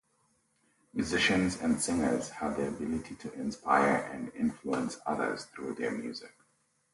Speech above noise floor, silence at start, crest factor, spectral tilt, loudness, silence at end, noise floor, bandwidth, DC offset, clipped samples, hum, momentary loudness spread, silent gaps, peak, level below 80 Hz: 41 dB; 0.95 s; 20 dB; -4 dB/octave; -32 LUFS; 0.65 s; -73 dBFS; 11.5 kHz; under 0.1%; under 0.1%; none; 13 LU; none; -12 dBFS; -58 dBFS